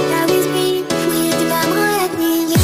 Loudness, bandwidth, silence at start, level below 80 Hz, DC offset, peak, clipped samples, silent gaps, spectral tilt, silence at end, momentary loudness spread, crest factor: -16 LUFS; 16 kHz; 0 s; -54 dBFS; 0.2%; -2 dBFS; under 0.1%; none; -4.5 dB/octave; 0 s; 2 LU; 14 dB